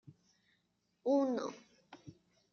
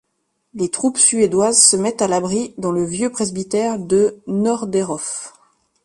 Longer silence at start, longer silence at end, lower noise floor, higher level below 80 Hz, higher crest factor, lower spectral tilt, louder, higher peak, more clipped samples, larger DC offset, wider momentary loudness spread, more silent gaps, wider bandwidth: first, 1.05 s vs 0.55 s; second, 0.4 s vs 0.55 s; first, -80 dBFS vs -71 dBFS; second, -84 dBFS vs -56 dBFS; about the same, 18 dB vs 18 dB; first, -5.5 dB/octave vs -3.5 dB/octave; second, -36 LUFS vs -17 LUFS; second, -22 dBFS vs 0 dBFS; neither; neither; first, 24 LU vs 12 LU; neither; second, 6.8 kHz vs 11.5 kHz